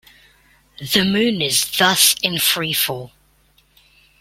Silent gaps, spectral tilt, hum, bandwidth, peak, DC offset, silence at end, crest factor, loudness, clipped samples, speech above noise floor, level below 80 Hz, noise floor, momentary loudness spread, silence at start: none; -2 dB/octave; none; 16.5 kHz; 0 dBFS; under 0.1%; 1.15 s; 20 dB; -16 LUFS; under 0.1%; 39 dB; -54 dBFS; -57 dBFS; 9 LU; 0.8 s